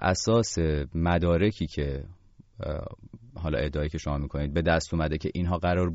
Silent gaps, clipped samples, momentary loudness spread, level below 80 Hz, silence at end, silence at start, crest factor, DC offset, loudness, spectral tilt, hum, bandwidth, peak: none; under 0.1%; 14 LU; -38 dBFS; 0 s; 0 s; 16 dB; under 0.1%; -28 LUFS; -6 dB/octave; none; 8 kHz; -12 dBFS